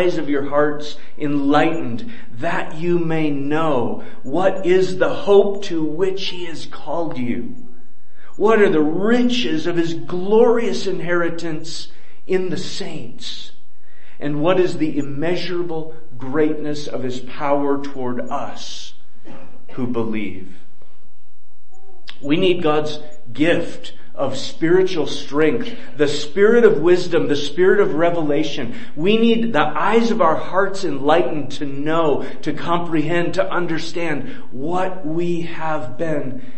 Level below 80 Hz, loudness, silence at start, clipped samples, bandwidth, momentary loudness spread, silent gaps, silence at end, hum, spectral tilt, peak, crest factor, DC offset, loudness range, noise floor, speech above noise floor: -58 dBFS; -20 LUFS; 0 s; under 0.1%; 8.8 kHz; 15 LU; none; 0.05 s; none; -6 dB/octave; 0 dBFS; 20 dB; 10%; 8 LU; -62 dBFS; 43 dB